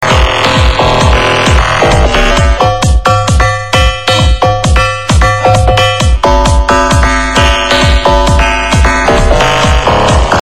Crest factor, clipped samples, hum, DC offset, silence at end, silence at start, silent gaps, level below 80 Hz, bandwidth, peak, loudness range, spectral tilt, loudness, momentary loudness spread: 8 dB; 0.5%; none; 3%; 0 s; 0 s; none; -12 dBFS; 13.5 kHz; 0 dBFS; 1 LU; -4.5 dB/octave; -8 LUFS; 2 LU